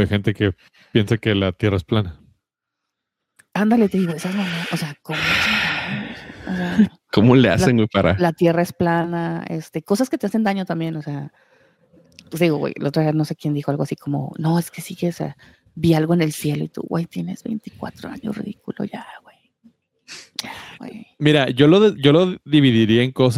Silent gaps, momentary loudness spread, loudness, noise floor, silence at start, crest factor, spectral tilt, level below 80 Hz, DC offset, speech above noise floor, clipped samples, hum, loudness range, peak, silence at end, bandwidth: none; 16 LU; -19 LUFS; -81 dBFS; 0 s; 18 dB; -6.5 dB/octave; -52 dBFS; under 0.1%; 62 dB; under 0.1%; none; 10 LU; -2 dBFS; 0 s; 16 kHz